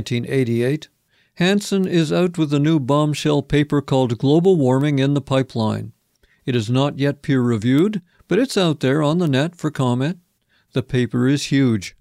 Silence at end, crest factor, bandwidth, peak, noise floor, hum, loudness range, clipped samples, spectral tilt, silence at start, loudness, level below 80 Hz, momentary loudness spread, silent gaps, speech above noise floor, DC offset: 0.1 s; 14 dB; 14.5 kHz; -6 dBFS; -62 dBFS; none; 3 LU; under 0.1%; -6.5 dB/octave; 0 s; -19 LUFS; -50 dBFS; 6 LU; none; 44 dB; under 0.1%